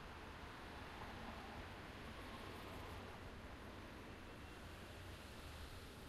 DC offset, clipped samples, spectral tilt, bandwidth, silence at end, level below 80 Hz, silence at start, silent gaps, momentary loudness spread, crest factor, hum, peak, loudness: under 0.1%; under 0.1%; -5 dB/octave; 15 kHz; 0 s; -60 dBFS; 0 s; none; 3 LU; 14 dB; none; -40 dBFS; -54 LUFS